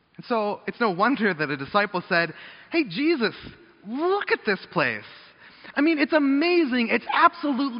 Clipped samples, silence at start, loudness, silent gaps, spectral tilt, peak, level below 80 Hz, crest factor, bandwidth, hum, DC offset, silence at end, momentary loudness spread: under 0.1%; 0.2 s; -23 LUFS; none; -3 dB/octave; -4 dBFS; -66 dBFS; 20 dB; 5.6 kHz; none; under 0.1%; 0 s; 8 LU